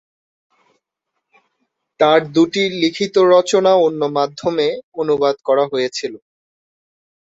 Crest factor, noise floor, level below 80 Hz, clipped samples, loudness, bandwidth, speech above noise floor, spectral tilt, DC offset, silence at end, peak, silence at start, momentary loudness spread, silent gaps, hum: 16 dB; -77 dBFS; -64 dBFS; under 0.1%; -16 LUFS; 8 kHz; 61 dB; -4.5 dB/octave; under 0.1%; 1.2 s; -2 dBFS; 2 s; 8 LU; 4.84-4.92 s; none